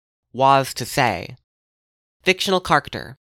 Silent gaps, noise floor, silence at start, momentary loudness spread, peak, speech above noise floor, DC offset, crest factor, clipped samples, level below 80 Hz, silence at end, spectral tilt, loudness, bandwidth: 1.44-2.20 s; under -90 dBFS; 0.35 s; 16 LU; 0 dBFS; over 70 dB; under 0.1%; 20 dB; under 0.1%; -50 dBFS; 0.1 s; -4 dB/octave; -19 LUFS; 17 kHz